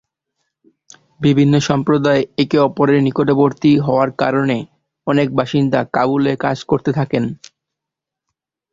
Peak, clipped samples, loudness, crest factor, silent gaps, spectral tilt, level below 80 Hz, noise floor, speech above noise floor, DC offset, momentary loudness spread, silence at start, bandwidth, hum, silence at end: 0 dBFS; under 0.1%; -16 LUFS; 16 dB; none; -7 dB/octave; -52 dBFS; -83 dBFS; 69 dB; under 0.1%; 7 LU; 1.2 s; 7.6 kHz; none; 1.4 s